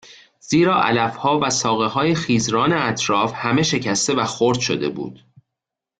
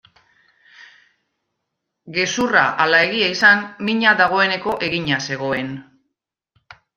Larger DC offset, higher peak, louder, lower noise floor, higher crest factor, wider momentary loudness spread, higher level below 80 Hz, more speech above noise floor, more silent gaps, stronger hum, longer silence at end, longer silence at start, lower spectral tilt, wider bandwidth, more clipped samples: neither; about the same, -4 dBFS vs -2 dBFS; about the same, -19 LUFS vs -17 LUFS; first, -84 dBFS vs -78 dBFS; about the same, 16 dB vs 20 dB; second, 4 LU vs 10 LU; first, -54 dBFS vs -60 dBFS; first, 65 dB vs 60 dB; neither; neither; second, 0.85 s vs 1.15 s; second, 0.1 s vs 0.8 s; about the same, -4 dB/octave vs -3.5 dB/octave; second, 9.4 kHz vs 14.5 kHz; neither